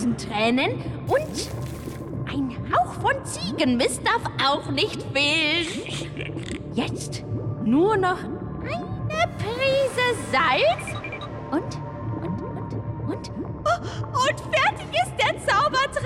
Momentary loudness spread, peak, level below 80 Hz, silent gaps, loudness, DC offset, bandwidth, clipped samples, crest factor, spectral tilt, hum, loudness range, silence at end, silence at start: 11 LU; -12 dBFS; -46 dBFS; none; -24 LUFS; under 0.1%; 16.5 kHz; under 0.1%; 12 dB; -4.5 dB/octave; none; 4 LU; 0 s; 0 s